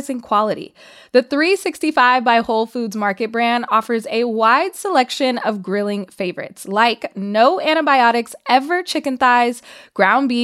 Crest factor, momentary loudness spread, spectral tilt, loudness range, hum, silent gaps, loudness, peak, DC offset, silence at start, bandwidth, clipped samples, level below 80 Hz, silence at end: 16 dB; 10 LU; -4 dB/octave; 2 LU; none; none; -17 LUFS; -2 dBFS; under 0.1%; 0 s; 15.5 kHz; under 0.1%; -64 dBFS; 0 s